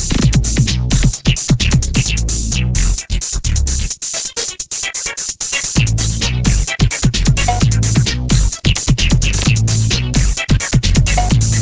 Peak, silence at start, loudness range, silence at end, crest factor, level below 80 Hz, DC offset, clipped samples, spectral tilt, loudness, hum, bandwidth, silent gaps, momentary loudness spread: 0 dBFS; 0 s; 3 LU; 0 s; 14 dB; -18 dBFS; under 0.1%; under 0.1%; -4 dB/octave; -15 LUFS; none; 8 kHz; none; 5 LU